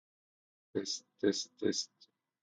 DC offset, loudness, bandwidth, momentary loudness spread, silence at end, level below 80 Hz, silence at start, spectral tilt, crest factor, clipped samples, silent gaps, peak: under 0.1%; -37 LUFS; 9.6 kHz; 8 LU; 0.55 s; -78 dBFS; 0.75 s; -3 dB/octave; 22 dB; under 0.1%; none; -16 dBFS